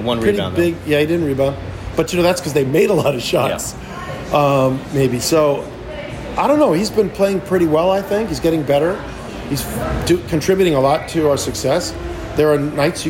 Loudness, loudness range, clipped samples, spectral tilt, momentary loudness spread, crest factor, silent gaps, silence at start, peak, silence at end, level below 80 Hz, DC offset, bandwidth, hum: -17 LUFS; 1 LU; under 0.1%; -5.5 dB/octave; 11 LU; 12 dB; none; 0 s; -4 dBFS; 0 s; -36 dBFS; under 0.1%; 16.5 kHz; none